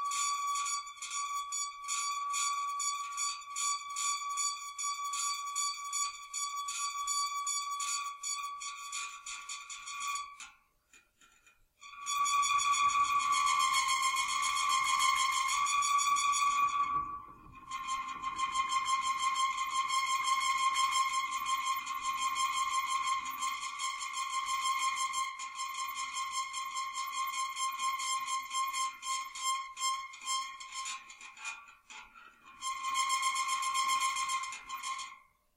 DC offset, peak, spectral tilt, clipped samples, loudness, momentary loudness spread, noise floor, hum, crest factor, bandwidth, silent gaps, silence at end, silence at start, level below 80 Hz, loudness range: under 0.1%; -18 dBFS; 3 dB/octave; under 0.1%; -33 LUFS; 12 LU; -66 dBFS; none; 18 dB; 16 kHz; none; 0.4 s; 0 s; -72 dBFS; 8 LU